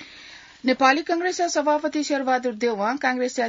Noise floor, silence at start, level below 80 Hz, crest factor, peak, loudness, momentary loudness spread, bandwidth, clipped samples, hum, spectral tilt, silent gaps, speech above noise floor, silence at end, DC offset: -45 dBFS; 0 s; -68 dBFS; 20 dB; -4 dBFS; -22 LUFS; 9 LU; 7.8 kHz; under 0.1%; none; -2.5 dB/octave; none; 23 dB; 0 s; under 0.1%